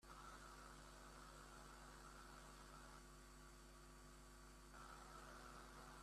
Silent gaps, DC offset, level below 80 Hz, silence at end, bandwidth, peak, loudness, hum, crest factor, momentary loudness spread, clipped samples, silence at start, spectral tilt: none; under 0.1%; -66 dBFS; 0 s; 14.5 kHz; -46 dBFS; -61 LUFS; none; 14 dB; 4 LU; under 0.1%; 0 s; -3.5 dB/octave